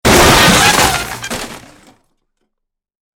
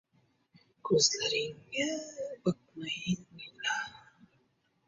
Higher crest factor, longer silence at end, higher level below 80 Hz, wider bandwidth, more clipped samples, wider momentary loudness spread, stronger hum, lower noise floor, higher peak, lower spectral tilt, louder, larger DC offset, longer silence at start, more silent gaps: second, 14 dB vs 24 dB; first, 1.6 s vs 0.9 s; first, -28 dBFS vs -70 dBFS; first, 19.5 kHz vs 7.6 kHz; first, 0.1% vs under 0.1%; about the same, 17 LU vs 15 LU; neither; about the same, -75 dBFS vs -74 dBFS; first, 0 dBFS vs -12 dBFS; about the same, -2.5 dB/octave vs -2.5 dB/octave; first, -8 LUFS vs -32 LUFS; neither; second, 0.05 s vs 0.85 s; neither